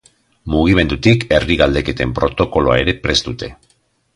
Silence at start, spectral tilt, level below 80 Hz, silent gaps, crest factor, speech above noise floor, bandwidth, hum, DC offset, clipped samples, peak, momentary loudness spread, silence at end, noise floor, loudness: 0.45 s; -5.5 dB/octave; -30 dBFS; none; 16 dB; 45 dB; 11.5 kHz; none; under 0.1%; under 0.1%; 0 dBFS; 11 LU; 0.6 s; -60 dBFS; -15 LUFS